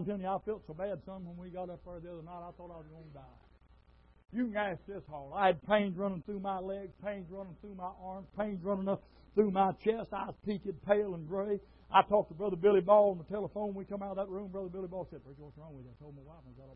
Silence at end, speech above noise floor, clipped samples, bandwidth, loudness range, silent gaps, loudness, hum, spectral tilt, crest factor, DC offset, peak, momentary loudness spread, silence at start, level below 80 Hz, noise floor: 0 s; 28 dB; under 0.1%; 5.2 kHz; 13 LU; none; -34 LUFS; none; -5 dB/octave; 24 dB; under 0.1%; -12 dBFS; 22 LU; 0 s; -62 dBFS; -63 dBFS